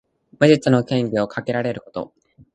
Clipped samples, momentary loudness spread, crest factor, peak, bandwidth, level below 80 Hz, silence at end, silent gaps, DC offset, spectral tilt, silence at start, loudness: under 0.1%; 17 LU; 20 dB; 0 dBFS; 10 kHz; -58 dBFS; 0.5 s; none; under 0.1%; -7 dB/octave; 0.4 s; -19 LUFS